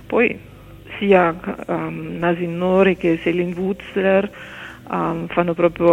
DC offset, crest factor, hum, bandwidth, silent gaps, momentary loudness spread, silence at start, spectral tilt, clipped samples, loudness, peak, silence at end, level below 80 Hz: under 0.1%; 18 dB; none; 11 kHz; none; 13 LU; 0 s; -8 dB/octave; under 0.1%; -19 LUFS; 0 dBFS; 0 s; -48 dBFS